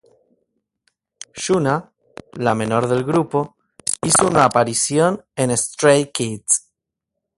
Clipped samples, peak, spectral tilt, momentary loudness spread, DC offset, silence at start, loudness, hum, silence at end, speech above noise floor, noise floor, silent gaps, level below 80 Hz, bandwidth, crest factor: under 0.1%; 0 dBFS; -4 dB/octave; 10 LU; under 0.1%; 1.35 s; -18 LUFS; none; 0.8 s; 63 dB; -81 dBFS; none; -54 dBFS; 12 kHz; 20 dB